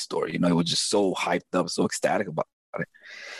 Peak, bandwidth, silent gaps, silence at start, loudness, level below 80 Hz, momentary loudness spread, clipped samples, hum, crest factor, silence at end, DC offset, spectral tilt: -10 dBFS; 12.5 kHz; 2.53-2.73 s; 0 s; -26 LUFS; -68 dBFS; 12 LU; under 0.1%; none; 16 dB; 0 s; under 0.1%; -4 dB/octave